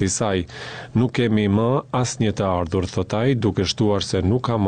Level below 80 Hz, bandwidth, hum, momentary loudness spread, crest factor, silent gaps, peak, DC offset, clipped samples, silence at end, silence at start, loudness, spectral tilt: -44 dBFS; 9.6 kHz; none; 5 LU; 12 dB; none; -8 dBFS; 0.2%; under 0.1%; 0 s; 0 s; -21 LUFS; -5.5 dB/octave